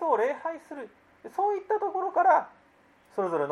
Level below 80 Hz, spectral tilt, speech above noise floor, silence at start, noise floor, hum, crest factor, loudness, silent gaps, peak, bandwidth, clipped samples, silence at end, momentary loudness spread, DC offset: -78 dBFS; -6.5 dB/octave; 33 dB; 0 s; -61 dBFS; none; 18 dB; -27 LUFS; none; -10 dBFS; 12 kHz; under 0.1%; 0 s; 20 LU; under 0.1%